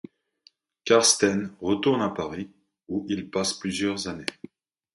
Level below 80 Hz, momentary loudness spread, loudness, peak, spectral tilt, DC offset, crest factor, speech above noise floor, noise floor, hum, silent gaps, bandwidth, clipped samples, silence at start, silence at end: -58 dBFS; 15 LU; -25 LUFS; -4 dBFS; -3 dB/octave; under 0.1%; 22 dB; 37 dB; -62 dBFS; none; none; 11.5 kHz; under 0.1%; 0.85 s; 0.65 s